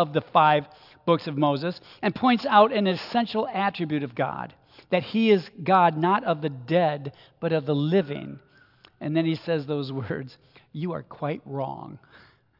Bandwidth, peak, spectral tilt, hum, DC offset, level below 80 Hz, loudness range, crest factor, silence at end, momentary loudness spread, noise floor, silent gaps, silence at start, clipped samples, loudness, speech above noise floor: 5.8 kHz; -4 dBFS; -8.5 dB/octave; none; under 0.1%; -70 dBFS; 7 LU; 20 dB; 0.65 s; 15 LU; -57 dBFS; none; 0 s; under 0.1%; -25 LUFS; 32 dB